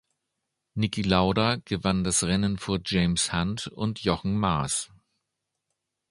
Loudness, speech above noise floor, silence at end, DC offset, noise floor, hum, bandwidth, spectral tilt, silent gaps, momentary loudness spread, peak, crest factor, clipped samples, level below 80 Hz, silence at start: -26 LUFS; 57 dB; 1.25 s; under 0.1%; -83 dBFS; none; 11.5 kHz; -4.5 dB/octave; none; 7 LU; -6 dBFS; 22 dB; under 0.1%; -46 dBFS; 0.75 s